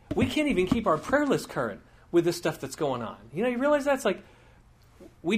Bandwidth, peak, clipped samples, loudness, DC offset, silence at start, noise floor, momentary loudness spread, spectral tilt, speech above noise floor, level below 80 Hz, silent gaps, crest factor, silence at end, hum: 15.5 kHz; -10 dBFS; under 0.1%; -27 LUFS; under 0.1%; 0.1 s; -56 dBFS; 10 LU; -5.5 dB/octave; 30 dB; -52 dBFS; none; 18 dB; 0 s; none